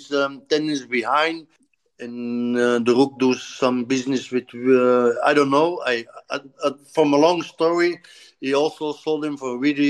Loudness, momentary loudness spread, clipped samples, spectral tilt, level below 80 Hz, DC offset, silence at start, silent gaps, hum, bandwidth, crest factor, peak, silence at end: -21 LUFS; 11 LU; under 0.1%; -5 dB/octave; -72 dBFS; under 0.1%; 0 s; none; none; 11.5 kHz; 16 dB; -4 dBFS; 0 s